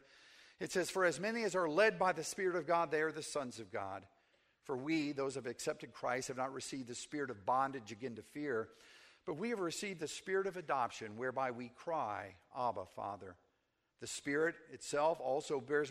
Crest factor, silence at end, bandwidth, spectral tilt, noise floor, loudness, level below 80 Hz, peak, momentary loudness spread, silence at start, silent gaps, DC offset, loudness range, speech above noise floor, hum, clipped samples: 20 dB; 0 s; 15.5 kHz; -4 dB/octave; -82 dBFS; -39 LUFS; -78 dBFS; -20 dBFS; 12 LU; 0.25 s; none; under 0.1%; 6 LU; 43 dB; none; under 0.1%